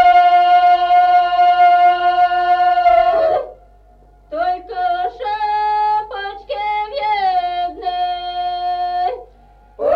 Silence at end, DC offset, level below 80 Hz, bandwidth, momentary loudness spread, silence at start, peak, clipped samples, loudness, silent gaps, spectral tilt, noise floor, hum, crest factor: 0 s; under 0.1%; -48 dBFS; 5.6 kHz; 11 LU; 0 s; -4 dBFS; under 0.1%; -15 LUFS; none; -4 dB/octave; -47 dBFS; none; 12 dB